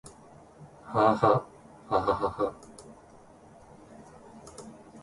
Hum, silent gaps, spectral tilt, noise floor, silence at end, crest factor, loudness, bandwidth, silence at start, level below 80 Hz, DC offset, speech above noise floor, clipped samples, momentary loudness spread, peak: none; none; -6.5 dB/octave; -54 dBFS; 0 s; 24 dB; -27 LUFS; 11.5 kHz; 0.05 s; -58 dBFS; under 0.1%; 28 dB; under 0.1%; 27 LU; -8 dBFS